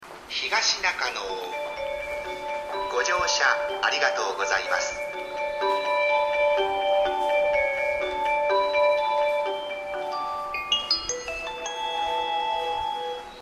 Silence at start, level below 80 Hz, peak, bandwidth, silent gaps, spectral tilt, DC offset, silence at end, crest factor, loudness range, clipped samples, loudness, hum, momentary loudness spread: 0 s; -54 dBFS; -8 dBFS; 14 kHz; none; -0.5 dB/octave; under 0.1%; 0 s; 18 dB; 4 LU; under 0.1%; -25 LUFS; none; 9 LU